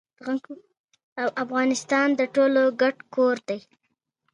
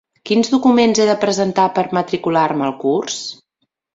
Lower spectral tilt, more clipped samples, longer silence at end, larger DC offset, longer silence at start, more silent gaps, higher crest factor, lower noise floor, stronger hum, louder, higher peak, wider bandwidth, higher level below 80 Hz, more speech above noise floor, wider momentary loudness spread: about the same, -3.5 dB/octave vs -4.5 dB/octave; neither; first, 0.75 s vs 0.6 s; neither; about the same, 0.25 s vs 0.25 s; first, 0.79-0.88 s, 1.03-1.16 s vs none; about the same, 16 dB vs 14 dB; first, -77 dBFS vs -71 dBFS; neither; second, -24 LUFS vs -16 LUFS; second, -8 dBFS vs -2 dBFS; first, 11 kHz vs 8 kHz; second, -78 dBFS vs -58 dBFS; about the same, 53 dB vs 56 dB; first, 13 LU vs 7 LU